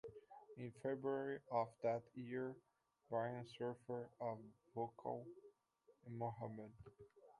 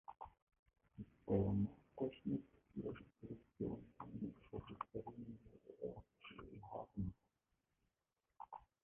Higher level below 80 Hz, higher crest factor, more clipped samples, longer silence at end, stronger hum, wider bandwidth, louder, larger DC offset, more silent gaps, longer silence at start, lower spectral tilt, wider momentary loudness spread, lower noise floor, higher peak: second, -82 dBFS vs -66 dBFS; about the same, 20 dB vs 24 dB; neither; about the same, 0.1 s vs 0.2 s; neither; first, 11 kHz vs 3.5 kHz; about the same, -47 LUFS vs -48 LUFS; neither; second, none vs 0.42-0.47 s, 0.59-0.66 s; about the same, 0.05 s vs 0.1 s; about the same, -8 dB/octave vs -8.5 dB/octave; about the same, 18 LU vs 18 LU; second, -77 dBFS vs under -90 dBFS; about the same, -28 dBFS vs -26 dBFS